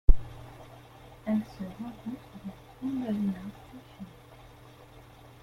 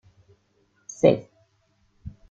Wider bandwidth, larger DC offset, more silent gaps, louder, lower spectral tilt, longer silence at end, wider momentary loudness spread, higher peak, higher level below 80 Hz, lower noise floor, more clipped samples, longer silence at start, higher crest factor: second, 5.8 kHz vs 7.8 kHz; neither; neither; second, -35 LUFS vs -22 LUFS; first, -8 dB/octave vs -6.5 dB/octave; first, 1.35 s vs 0.2 s; second, 21 LU vs 25 LU; about the same, -4 dBFS vs -4 dBFS; first, -34 dBFS vs -56 dBFS; second, -52 dBFS vs -67 dBFS; neither; second, 0.1 s vs 1.05 s; about the same, 26 dB vs 24 dB